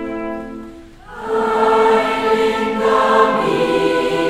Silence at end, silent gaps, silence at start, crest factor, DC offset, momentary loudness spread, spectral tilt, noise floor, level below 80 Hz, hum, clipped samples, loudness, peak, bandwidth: 0 s; none; 0 s; 16 dB; under 0.1%; 16 LU; -5 dB/octave; -36 dBFS; -44 dBFS; none; under 0.1%; -15 LUFS; 0 dBFS; 13.5 kHz